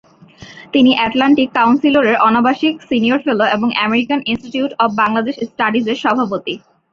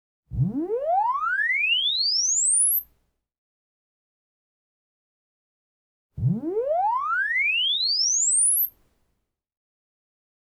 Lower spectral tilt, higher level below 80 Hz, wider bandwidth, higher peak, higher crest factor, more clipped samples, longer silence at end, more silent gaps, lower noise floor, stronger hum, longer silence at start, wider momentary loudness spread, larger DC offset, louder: first, -5.5 dB/octave vs -1.5 dB/octave; about the same, -54 dBFS vs -54 dBFS; second, 7 kHz vs 13.5 kHz; first, -2 dBFS vs -12 dBFS; about the same, 14 dB vs 14 dB; neither; second, 0.35 s vs 1.85 s; second, none vs 3.38-6.10 s; second, -40 dBFS vs -76 dBFS; neither; about the same, 0.4 s vs 0.3 s; about the same, 8 LU vs 10 LU; neither; first, -14 LUFS vs -21 LUFS